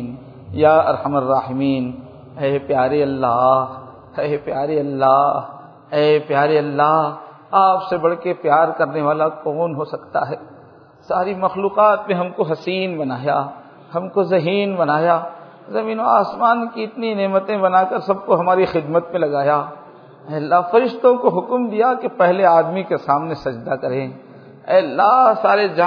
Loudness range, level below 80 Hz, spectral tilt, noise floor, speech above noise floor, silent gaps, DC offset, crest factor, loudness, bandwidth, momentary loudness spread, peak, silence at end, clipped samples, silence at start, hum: 3 LU; -60 dBFS; -8.5 dB/octave; -45 dBFS; 28 dB; none; under 0.1%; 18 dB; -18 LUFS; 5.4 kHz; 11 LU; 0 dBFS; 0 s; under 0.1%; 0 s; none